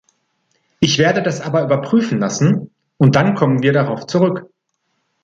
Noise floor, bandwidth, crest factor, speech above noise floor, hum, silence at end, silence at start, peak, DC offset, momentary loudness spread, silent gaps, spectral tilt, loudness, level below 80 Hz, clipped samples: -70 dBFS; 7.8 kHz; 16 dB; 55 dB; none; 0.8 s; 0.8 s; 0 dBFS; under 0.1%; 6 LU; none; -6 dB/octave; -16 LUFS; -52 dBFS; under 0.1%